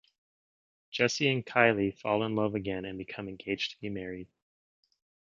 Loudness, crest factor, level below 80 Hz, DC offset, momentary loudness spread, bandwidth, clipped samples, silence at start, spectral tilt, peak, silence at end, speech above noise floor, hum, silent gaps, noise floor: -30 LUFS; 26 dB; -64 dBFS; under 0.1%; 15 LU; 7.6 kHz; under 0.1%; 0.9 s; -5 dB/octave; -6 dBFS; 1.15 s; over 59 dB; none; none; under -90 dBFS